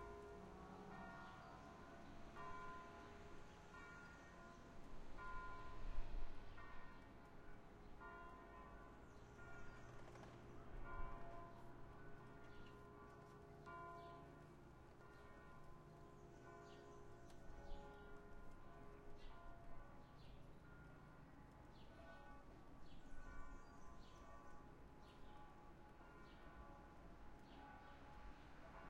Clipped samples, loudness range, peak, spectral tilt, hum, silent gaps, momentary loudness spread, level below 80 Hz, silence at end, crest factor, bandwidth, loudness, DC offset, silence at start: under 0.1%; 5 LU; -34 dBFS; -6 dB/octave; none; none; 8 LU; -60 dBFS; 0 s; 22 dB; 8.8 kHz; -61 LUFS; under 0.1%; 0 s